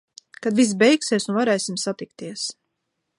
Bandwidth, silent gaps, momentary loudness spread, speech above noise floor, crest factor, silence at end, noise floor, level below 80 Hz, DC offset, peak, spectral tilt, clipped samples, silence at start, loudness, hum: 11.5 kHz; none; 13 LU; 56 dB; 18 dB; 0.65 s; -77 dBFS; -72 dBFS; under 0.1%; -4 dBFS; -4 dB/octave; under 0.1%; 0.4 s; -21 LUFS; none